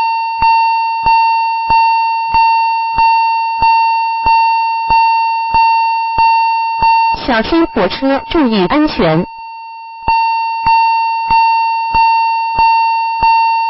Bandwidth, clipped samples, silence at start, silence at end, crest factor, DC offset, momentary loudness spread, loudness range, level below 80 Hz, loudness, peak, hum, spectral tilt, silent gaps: 5.8 kHz; under 0.1%; 0 s; 0 s; 12 dB; under 0.1%; 4 LU; 2 LU; -36 dBFS; -11 LUFS; 0 dBFS; 50 Hz at -50 dBFS; -9 dB/octave; none